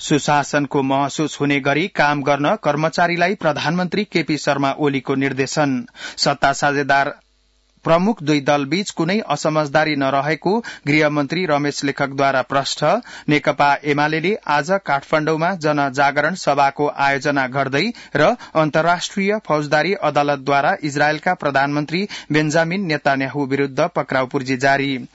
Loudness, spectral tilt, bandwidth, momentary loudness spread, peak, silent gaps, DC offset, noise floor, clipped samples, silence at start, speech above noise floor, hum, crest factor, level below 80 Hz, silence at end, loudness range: -18 LUFS; -5 dB/octave; 8 kHz; 4 LU; -4 dBFS; none; under 0.1%; -60 dBFS; under 0.1%; 0 s; 41 dB; none; 14 dB; -56 dBFS; 0.1 s; 1 LU